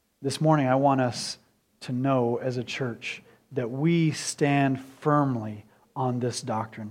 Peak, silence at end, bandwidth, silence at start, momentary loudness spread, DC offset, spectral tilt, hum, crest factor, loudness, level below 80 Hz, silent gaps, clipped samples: -8 dBFS; 0 s; 14.5 kHz; 0.2 s; 13 LU; under 0.1%; -6 dB/octave; none; 18 dB; -26 LUFS; -70 dBFS; none; under 0.1%